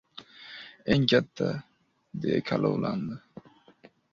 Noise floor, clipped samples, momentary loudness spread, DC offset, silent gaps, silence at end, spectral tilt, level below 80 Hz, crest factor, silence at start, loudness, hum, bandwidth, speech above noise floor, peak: -58 dBFS; under 0.1%; 20 LU; under 0.1%; none; 0.95 s; -7 dB/octave; -58 dBFS; 24 dB; 0.15 s; -28 LUFS; none; 7.4 kHz; 31 dB; -6 dBFS